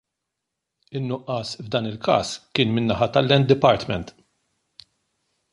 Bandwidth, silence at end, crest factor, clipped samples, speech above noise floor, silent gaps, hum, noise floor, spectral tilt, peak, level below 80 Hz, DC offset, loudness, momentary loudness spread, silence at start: 11 kHz; 1.4 s; 20 dB; under 0.1%; 61 dB; none; none; -82 dBFS; -6 dB/octave; -2 dBFS; -52 dBFS; under 0.1%; -22 LUFS; 12 LU; 0.9 s